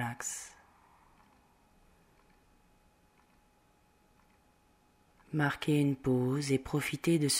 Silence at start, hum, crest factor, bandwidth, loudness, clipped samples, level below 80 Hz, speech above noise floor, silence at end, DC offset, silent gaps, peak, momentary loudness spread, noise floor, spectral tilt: 0 s; none; 18 dB; 16 kHz; -32 LUFS; under 0.1%; -64 dBFS; 37 dB; 0 s; under 0.1%; none; -18 dBFS; 9 LU; -68 dBFS; -5 dB/octave